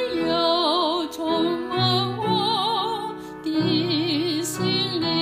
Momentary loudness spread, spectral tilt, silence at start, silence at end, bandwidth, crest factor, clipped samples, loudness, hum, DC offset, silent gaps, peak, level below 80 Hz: 6 LU; -5 dB/octave; 0 s; 0 s; 15.5 kHz; 14 dB; under 0.1%; -22 LUFS; none; under 0.1%; none; -8 dBFS; -58 dBFS